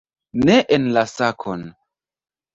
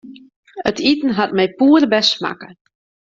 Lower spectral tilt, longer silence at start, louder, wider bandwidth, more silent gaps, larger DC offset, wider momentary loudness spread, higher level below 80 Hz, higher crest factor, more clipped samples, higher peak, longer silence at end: about the same, -5.5 dB/octave vs -4.5 dB/octave; first, 0.35 s vs 0.05 s; about the same, -18 LUFS vs -16 LUFS; about the same, 7.8 kHz vs 7.6 kHz; second, none vs 0.36-0.43 s; neither; first, 15 LU vs 11 LU; about the same, -52 dBFS vs -56 dBFS; about the same, 18 dB vs 18 dB; neither; about the same, -2 dBFS vs 0 dBFS; first, 0.85 s vs 0.6 s